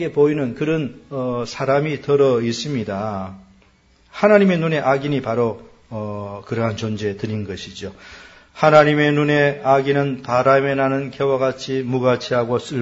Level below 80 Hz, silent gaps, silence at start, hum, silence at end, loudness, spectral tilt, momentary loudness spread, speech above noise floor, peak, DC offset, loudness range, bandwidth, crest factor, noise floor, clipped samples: -54 dBFS; none; 0 s; none; 0 s; -19 LUFS; -6.5 dB/octave; 15 LU; 36 dB; 0 dBFS; under 0.1%; 6 LU; 8 kHz; 18 dB; -55 dBFS; under 0.1%